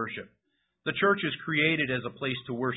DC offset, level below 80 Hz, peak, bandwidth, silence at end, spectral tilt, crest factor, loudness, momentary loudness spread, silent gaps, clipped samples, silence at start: under 0.1%; -66 dBFS; -10 dBFS; 4 kHz; 0 s; -9.5 dB/octave; 20 dB; -28 LUFS; 11 LU; none; under 0.1%; 0 s